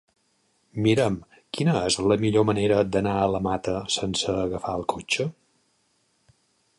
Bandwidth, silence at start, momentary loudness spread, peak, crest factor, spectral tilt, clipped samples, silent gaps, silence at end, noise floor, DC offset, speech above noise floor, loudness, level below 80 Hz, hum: 11.5 kHz; 0.75 s; 7 LU; -8 dBFS; 18 dB; -5 dB/octave; under 0.1%; none; 1.45 s; -68 dBFS; under 0.1%; 45 dB; -24 LUFS; -50 dBFS; none